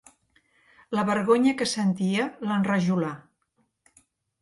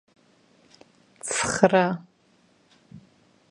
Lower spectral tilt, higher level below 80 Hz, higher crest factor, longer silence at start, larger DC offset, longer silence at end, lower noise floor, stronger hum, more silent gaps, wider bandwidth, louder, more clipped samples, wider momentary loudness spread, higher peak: first, -5.5 dB/octave vs -4 dB/octave; second, -68 dBFS vs -60 dBFS; second, 18 dB vs 28 dB; second, 0.9 s vs 1.25 s; neither; first, 1.25 s vs 0.5 s; first, -72 dBFS vs -62 dBFS; neither; neither; about the same, 11.5 kHz vs 11.5 kHz; about the same, -25 LUFS vs -23 LUFS; neither; second, 9 LU vs 16 LU; second, -8 dBFS vs 0 dBFS